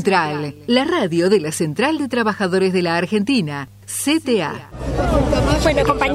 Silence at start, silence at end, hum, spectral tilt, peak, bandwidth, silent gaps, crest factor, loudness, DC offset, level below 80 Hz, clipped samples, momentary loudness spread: 0 s; 0 s; none; -5 dB/octave; -2 dBFS; 16 kHz; none; 16 dB; -18 LUFS; under 0.1%; -30 dBFS; under 0.1%; 9 LU